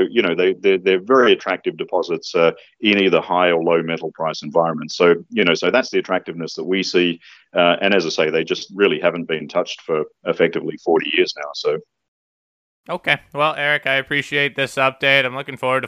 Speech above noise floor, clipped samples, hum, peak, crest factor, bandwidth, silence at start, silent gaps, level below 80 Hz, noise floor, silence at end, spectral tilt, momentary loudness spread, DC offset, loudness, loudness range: over 72 dB; under 0.1%; none; 0 dBFS; 18 dB; 11.5 kHz; 0 s; 12.08-12.84 s; -66 dBFS; under -90 dBFS; 0 s; -4.5 dB/octave; 9 LU; under 0.1%; -18 LUFS; 4 LU